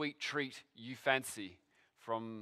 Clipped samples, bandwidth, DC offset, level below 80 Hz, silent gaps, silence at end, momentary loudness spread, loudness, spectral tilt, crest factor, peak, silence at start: under 0.1%; 15.5 kHz; under 0.1%; -84 dBFS; none; 0 s; 16 LU; -38 LUFS; -3.5 dB/octave; 24 dB; -16 dBFS; 0 s